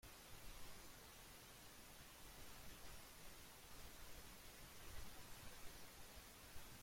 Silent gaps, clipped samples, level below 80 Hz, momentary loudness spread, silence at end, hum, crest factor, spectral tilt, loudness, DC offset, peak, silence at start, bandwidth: none; under 0.1%; -66 dBFS; 2 LU; 0 s; none; 16 dB; -2.5 dB/octave; -60 LUFS; under 0.1%; -42 dBFS; 0.05 s; 16.5 kHz